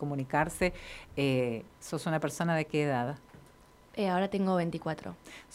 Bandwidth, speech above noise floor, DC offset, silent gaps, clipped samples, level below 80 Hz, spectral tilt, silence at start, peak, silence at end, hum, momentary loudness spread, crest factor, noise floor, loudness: 16 kHz; 26 dB; under 0.1%; none; under 0.1%; -56 dBFS; -6 dB/octave; 0 s; -12 dBFS; 0 s; none; 12 LU; 20 dB; -58 dBFS; -32 LUFS